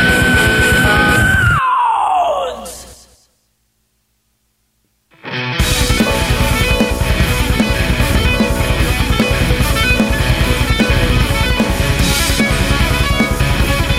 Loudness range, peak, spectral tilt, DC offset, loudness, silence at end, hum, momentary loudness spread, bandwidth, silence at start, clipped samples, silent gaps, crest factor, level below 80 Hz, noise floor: 8 LU; 0 dBFS; -4.5 dB/octave; under 0.1%; -13 LUFS; 0 s; none; 5 LU; 16.5 kHz; 0 s; under 0.1%; none; 14 dB; -20 dBFS; -63 dBFS